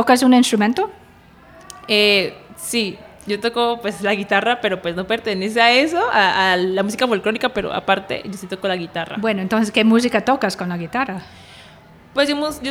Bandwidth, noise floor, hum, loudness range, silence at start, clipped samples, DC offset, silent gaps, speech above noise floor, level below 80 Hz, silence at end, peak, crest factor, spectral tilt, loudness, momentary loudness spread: 16.5 kHz; -46 dBFS; none; 3 LU; 0 s; under 0.1%; under 0.1%; none; 28 dB; -54 dBFS; 0 s; 0 dBFS; 18 dB; -4 dB/octave; -18 LUFS; 12 LU